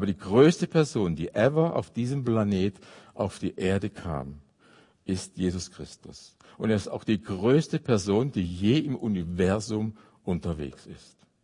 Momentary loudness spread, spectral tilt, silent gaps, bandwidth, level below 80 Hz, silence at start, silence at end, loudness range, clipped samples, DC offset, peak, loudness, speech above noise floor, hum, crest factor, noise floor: 16 LU; -6.5 dB/octave; none; 11 kHz; -56 dBFS; 0 s; 0.45 s; 7 LU; under 0.1%; under 0.1%; -6 dBFS; -27 LUFS; 32 dB; none; 20 dB; -59 dBFS